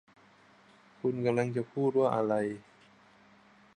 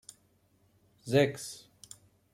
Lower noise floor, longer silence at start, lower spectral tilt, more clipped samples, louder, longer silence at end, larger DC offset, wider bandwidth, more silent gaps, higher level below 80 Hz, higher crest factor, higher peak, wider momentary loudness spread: second, -61 dBFS vs -69 dBFS; about the same, 1.05 s vs 1.05 s; first, -8 dB/octave vs -5.5 dB/octave; neither; about the same, -31 LUFS vs -30 LUFS; first, 1.2 s vs 0.75 s; neither; second, 10 kHz vs 16 kHz; neither; about the same, -76 dBFS vs -72 dBFS; second, 18 dB vs 24 dB; about the same, -14 dBFS vs -12 dBFS; second, 8 LU vs 25 LU